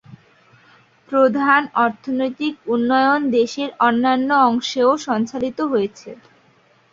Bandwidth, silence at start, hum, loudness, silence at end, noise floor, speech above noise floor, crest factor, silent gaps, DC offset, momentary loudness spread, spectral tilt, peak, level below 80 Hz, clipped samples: 7.6 kHz; 0.1 s; none; -18 LUFS; 0.75 s; -56 dBFS; 38 dB; 18 dB; none; under 0.1%; 7 LU; -4.5 dB/octave; -2 dBFS; -62 dBFS; under 0.1%